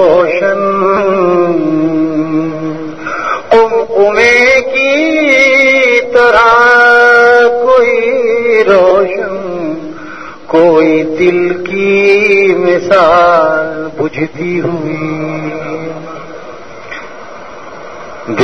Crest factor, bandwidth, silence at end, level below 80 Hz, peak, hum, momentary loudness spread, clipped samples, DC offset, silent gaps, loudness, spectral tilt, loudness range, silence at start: 10 dB; 9.6 kHz; 0 s; -44 dBFS; 0 dBFS; none; 20 LU; 0.6%; 2%; none; -9 LUFS; -5 dB/octave; 12 LU; 0 s